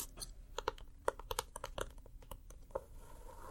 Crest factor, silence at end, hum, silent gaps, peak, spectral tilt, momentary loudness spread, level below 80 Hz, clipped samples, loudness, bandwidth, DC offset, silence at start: 32 dB; 0 s; none; none; -14 dBFS; -2.5 dB/octave; 14 LU; -54 dBFS; under 0.1%; -46 LUFS; 16.5 kHz; under 0.1%; 0 s